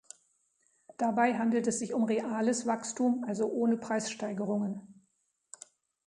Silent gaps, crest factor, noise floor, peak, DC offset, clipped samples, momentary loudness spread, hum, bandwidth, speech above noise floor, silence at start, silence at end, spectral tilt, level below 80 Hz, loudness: none; 18 dB; -77 dBFS; -14 dBFS; under 0.1%; under 0.1%; 9 LU; none; 11 kHz; 46 dB; 1 s; 1.15 s; -5 dB/octave; -78 dBFS; -31 LUFS